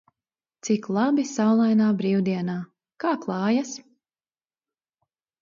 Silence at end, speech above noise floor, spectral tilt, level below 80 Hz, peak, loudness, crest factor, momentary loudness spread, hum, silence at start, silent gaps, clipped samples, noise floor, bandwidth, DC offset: 1.65 s; over 68 dB; -6 dB/octave; -74 dBFS; -10 dBFS; -24 LUFS; 16 dB; 15 LU; none; 0.65 s; none; under 0.1%; under -90 dBFS; 7.6 kHz; under 0.1%